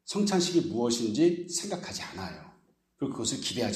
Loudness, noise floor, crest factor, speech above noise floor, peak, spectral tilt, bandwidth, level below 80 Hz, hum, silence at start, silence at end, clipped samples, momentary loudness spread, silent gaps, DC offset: -29 LUFS; -64 dBFS; 16 dB; 35 dB; -14 dBFS; -4 dB/octave; 14 kHz; -66 dBFS; none; 0.05 s; 0 s; under 0.1%; 13 LU; none; under 0.1%